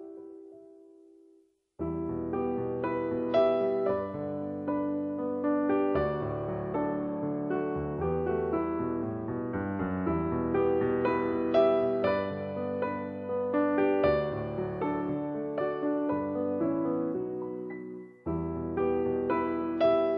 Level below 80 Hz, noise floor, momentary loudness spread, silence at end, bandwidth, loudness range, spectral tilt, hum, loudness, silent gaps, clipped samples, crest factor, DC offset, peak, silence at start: -54 dBFS; -64 dBFS; 9 LU; 0 s; 5.8 kHz; 4 LU; -10 dB/octave; none; -30 LUFS; none; under 0.1%; 18 dB; under 0.1%; -12 dBFS; 0 s